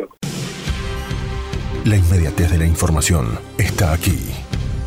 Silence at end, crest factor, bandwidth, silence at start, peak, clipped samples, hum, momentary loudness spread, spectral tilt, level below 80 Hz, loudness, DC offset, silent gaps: 0 s; 12 dB; 16.5 kHz; 0 s; -6 dBFS; under 0.1%; none; 10 LU; -5 dB/octave; -26 dBFS; -19 LUFS; under 0.1%; none